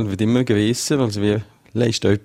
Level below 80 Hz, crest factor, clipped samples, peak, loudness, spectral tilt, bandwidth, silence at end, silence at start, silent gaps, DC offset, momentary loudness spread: -50 dBFS; 16 dB; under 0.1%; -4 dBFS; -19 LUFS; -5.5 dB/octave; 16 kHz; 0.05 s; 0 s; none; under 0.1%; 5 LU